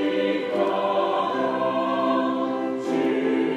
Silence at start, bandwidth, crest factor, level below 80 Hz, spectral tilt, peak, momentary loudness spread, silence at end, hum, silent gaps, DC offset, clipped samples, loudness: 0 s; 10 kHz; 12 dB; -72 dBFS; -6 dB/octave; -10 dBFS; 3 LU; 0 s; none; none; under 0.1%; under 0.1%; -24 LUFS